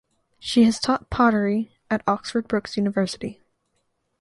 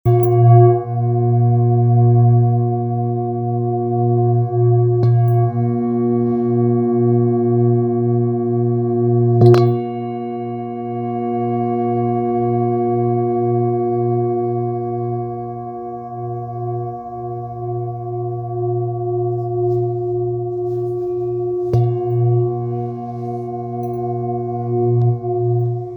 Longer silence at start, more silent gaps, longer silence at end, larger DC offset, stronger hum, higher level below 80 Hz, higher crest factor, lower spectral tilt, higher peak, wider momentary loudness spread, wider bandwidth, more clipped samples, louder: first, 0.45 s vs 0.05 s; neither; first, 0.9 s vs 0 s; neither; neither; about the same, -50 dBFS vs -52 dBFS; about the same, 18 dB vs 16 dB; second, -5.5 dB/octave vs -11.5 dB/octave; second, -6 dBFS vs 0 dBFS; second, 9 LU vs 12 LU; second, 11.5 kHz vs over 20 kHz; neither; second, -22 LUFS vs -18 LUFS